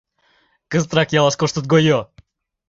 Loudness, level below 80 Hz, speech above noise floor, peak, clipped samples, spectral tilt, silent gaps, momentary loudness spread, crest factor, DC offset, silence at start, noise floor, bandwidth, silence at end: -17 LUFS; -52 dBFS; 44 dB; -2 dBFS; under 0.1%; -5 dB/octave; none; 7 LU; 18 dB; under 0.1%; 0.7 s; -61 dBFS; 7.8 kHz; 0.65 s